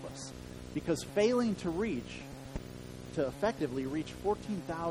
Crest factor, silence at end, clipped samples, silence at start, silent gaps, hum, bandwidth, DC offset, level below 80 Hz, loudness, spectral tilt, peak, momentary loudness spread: 18 dB; 0 s; under 0.1%; 0 s; none; none; over 20 kHz; under 0.1%; -54 dBFS; -35 LUFS; -5.5 dB/octave; -16 dBFS; 15 LU